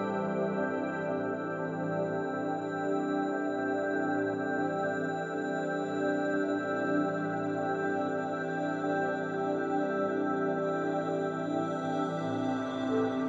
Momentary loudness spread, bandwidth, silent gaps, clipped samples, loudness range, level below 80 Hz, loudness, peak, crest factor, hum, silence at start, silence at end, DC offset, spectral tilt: 3 LU; 7.6 kHz; none; under 0.1%; 1 LU; -76 dBFS; -32 LUFS; -18 dBFS; 12 dB; none; 0 s; 0 s; under 0.1%; -7 dB/octave